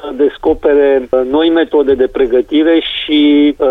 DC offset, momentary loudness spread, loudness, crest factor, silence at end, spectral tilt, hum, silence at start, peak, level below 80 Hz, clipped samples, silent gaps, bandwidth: under 0.1%; 4 LU; -11 LUFS; 10 dB; 0 s; -6.5 dB/octave; none; 0 s; -2 dBFS; -38 dBFS; under 0.1%; none; 4.1 kHz